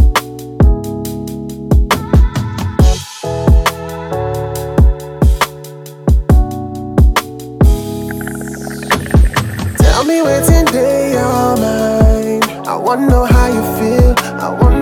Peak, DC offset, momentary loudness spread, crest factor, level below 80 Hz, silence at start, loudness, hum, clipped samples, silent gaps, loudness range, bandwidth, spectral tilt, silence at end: 0 dBFS; under 0.1%; 11 LU; 12 dB; -14 dBFS; 0 s; -13 LUFS; none; under 0.1%; none; 3 LU; 17 kHz; -6 dB/octave; 0 s